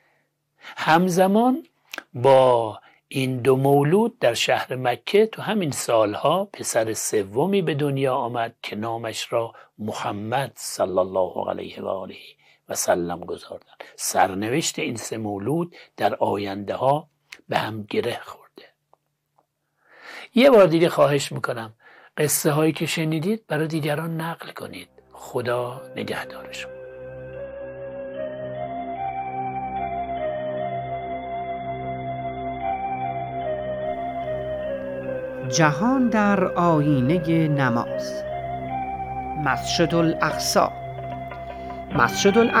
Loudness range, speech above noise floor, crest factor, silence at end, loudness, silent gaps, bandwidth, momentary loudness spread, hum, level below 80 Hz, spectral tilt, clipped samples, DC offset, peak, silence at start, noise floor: 10 LU; 47 dB; 22 dB; 0 s; -23 LUFS; none; 16 kHz; 16 LU; none; -52 dBFS; -5 dB/octave; under 0.1%; under 0.1%; -2 dBFS; 0.65 s; -68 dBFS